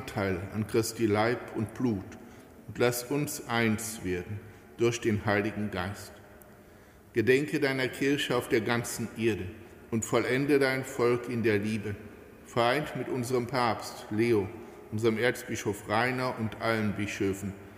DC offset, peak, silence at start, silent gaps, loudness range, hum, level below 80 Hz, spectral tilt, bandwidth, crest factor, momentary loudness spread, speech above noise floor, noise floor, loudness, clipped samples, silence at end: under 0.1%; -10 dBFS; 0 s; none; 3 LU; none; -60 dBFS; -5 dB/octave; 16 kHz; 18 dB; 12 LU; 25 dB; -54 dBFS; -30 LUFS; under 0.1%; 0 s